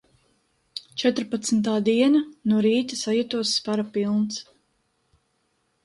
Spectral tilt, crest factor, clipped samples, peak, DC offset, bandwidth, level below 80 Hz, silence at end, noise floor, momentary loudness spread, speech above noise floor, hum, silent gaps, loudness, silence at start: -4.5 dB/octave; 16 dB; under 0.1%; -8 dBFS; under 0.1%; 11.5 kHz; -68 dBFS; 1.45 s; -71 dBFS; 10 LU; 48 dB; none; none; -23 LUFS; 0.75 s